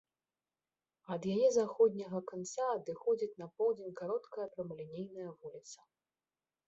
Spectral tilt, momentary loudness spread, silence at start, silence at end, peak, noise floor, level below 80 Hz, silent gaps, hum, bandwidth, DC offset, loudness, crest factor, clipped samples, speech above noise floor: -6 dB/octave; 17 LU; 1.1 s; 0.95 s; -18 dBFS; under -90 dBFS; -80 dBFS; none; none; 8 kHz; under 0.1%; -36 LUFS; 18 dB; under 0.1%; over 54 dB